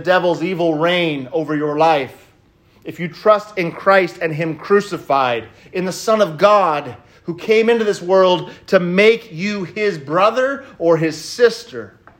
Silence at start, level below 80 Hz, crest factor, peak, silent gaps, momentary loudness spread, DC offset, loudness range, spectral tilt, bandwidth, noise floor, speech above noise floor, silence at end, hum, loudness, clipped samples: 0 s; -60 dBFS; 16 dB; 0 dBFS; none; 14 LU; under 0.1%; 3 LU; -5.5 dB/octave; 16 kHz; -52 dBFS; 36 dB; 0.3 s; none; -16 LUFS; under 0.1%